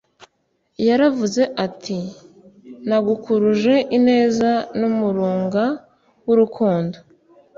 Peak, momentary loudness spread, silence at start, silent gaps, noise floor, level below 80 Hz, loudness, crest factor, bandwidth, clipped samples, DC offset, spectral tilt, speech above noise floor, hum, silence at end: -4 dBFS; 12 LU; 0.8 s; none; -68 dBFS; -60 dBFS; -19 LUFS; 16 dB; 7.6 kHz; under 0.1%; under 0.1%; -6.5 dB/octave; 50 dB; none; 0.6 s